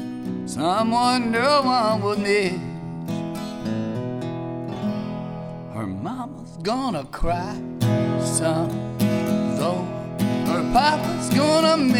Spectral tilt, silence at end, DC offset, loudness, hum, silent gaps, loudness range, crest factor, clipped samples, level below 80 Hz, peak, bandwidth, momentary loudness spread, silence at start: -5.5 dB/octave; 0 s; under 0.1%; -23 LUFS; none; none; 8 LU; 16 dB; under 0.1%; -42 dBFS; -6 dBFS; 19 kHz; 12 LU; 0 s